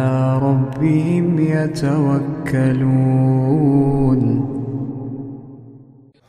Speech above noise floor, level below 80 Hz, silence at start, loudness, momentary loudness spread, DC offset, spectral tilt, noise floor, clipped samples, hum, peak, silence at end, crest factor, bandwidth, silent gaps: 30 dB; -42 dBFS; 0 s; -17 LUFS; 11 LU; under 0.1%; -9.5 dB/octave; -46 dBFS; under 0.1%; none; -4 dBFS; 0.45 s; 14 dB; 10 kHz; none